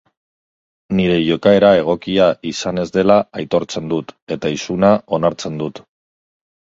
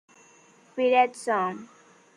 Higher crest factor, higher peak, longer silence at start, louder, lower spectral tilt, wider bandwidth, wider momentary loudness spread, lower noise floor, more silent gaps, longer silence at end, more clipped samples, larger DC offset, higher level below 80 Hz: about the same, 16 dB vs 18 dB; first, 0 dBFS vs -10 dBFS; first, 0.9 s vs 0.75 s; first, -16 LUFS vs -25 LUFS; first, -6 dB/octave vs -4 dB/octave; second, 7.8 kHz vs 10.5 kHz; second, 12 LU vs 17 LU; first, under -90 dBFS vs -57 dBFS; first, 4.22-4.27 s vs none; first, 0.9 s vs 0.5 s; neither; neither; first, -48 dBFS vs -82 dBFS